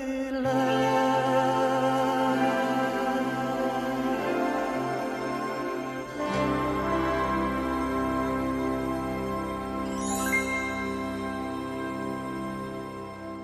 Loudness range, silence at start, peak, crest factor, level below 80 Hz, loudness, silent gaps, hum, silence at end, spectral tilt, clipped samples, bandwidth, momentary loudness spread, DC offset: 5 LU; 0 s; -12 dBFS; 16 dB; -48 dBFS; -28 LUFS; none; none; 0 s; -5 dB/octave; under 0.1%; 16 kHz; 9 LU; under 0.1%